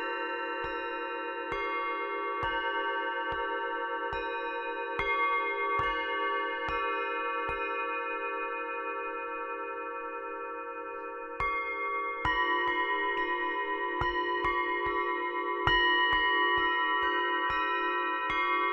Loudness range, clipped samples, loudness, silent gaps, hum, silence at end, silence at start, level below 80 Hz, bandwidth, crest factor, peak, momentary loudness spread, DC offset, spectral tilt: 8 LU; under 0.1%; -30 LUFS; none; none; 0 s; 0 s; -54 dBFS; 7.6 kHz; 22 dB; -10 dBFS; 10 LU; under 0.1%; -5.5 dB/octave